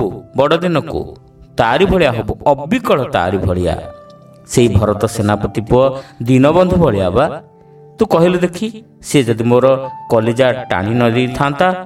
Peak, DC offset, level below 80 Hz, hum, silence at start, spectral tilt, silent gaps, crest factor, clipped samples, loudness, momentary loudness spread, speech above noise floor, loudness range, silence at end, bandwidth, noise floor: 0 dBFS; under 0.1%; -36 dBFS; none; 0 s; -6.5 dB/octave; none; 14 dB; under 0.1%; -14 LUFS; 9 LU; 28 dB; 2 LU; 0 s; 15.5 kHz; -41 dBFS